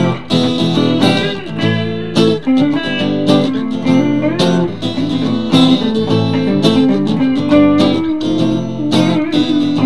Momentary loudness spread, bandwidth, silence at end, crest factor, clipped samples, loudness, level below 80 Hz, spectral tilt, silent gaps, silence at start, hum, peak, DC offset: 6 LU; 12 kHz; 0 s; 12 dB; under 0.1%; -13 LUFS; -44 dBFS; -6.5 dB/octave; none; 0 s; none; 0 dBFS; 2%